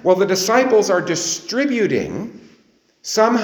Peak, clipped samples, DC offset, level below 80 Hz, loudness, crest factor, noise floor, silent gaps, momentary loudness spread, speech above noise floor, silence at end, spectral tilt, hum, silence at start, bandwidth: 0 dBFS; under 0.1%; under 0.1%; -58 dBFS; -17 LUFS; 18 dB; -57 dBFS; none; 14 LU; 40 dB; 0 s; -3.5 dB/octave; none; 0.05 s; over 20 kHz